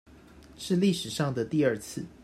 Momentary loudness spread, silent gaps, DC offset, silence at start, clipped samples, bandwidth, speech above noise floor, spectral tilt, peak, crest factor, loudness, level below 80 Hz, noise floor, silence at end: 11 LU; none; under 0.1%; 0.3 s; under 0.1%; 15 kHz; 24 dB; -5.5 dB/octave; -12 dBFS; 16 dB; -28 LUFS; -60 dBFS; -52 dBFS; 0.15 s